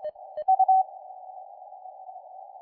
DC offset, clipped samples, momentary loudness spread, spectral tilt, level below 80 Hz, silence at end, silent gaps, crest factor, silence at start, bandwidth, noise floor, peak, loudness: under 0.1%; under 0.1%; 24 LU; -5.5 dB/octave; -82 dBFS; 0.05 s; none; 16 dB; 0 s; 3.2 kHz; -45 dBFS; -12 dBFS; -24 LUFS